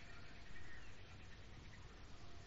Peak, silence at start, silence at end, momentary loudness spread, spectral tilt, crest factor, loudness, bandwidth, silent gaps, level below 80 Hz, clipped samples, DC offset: -40 dBFS; 0 s; 0 s; 2 LU; -3.5 dB/octave; 12 dB; -59 LUFS; 7.6 kHz; none; -62 dBFS; under 0.1%; under 0.1%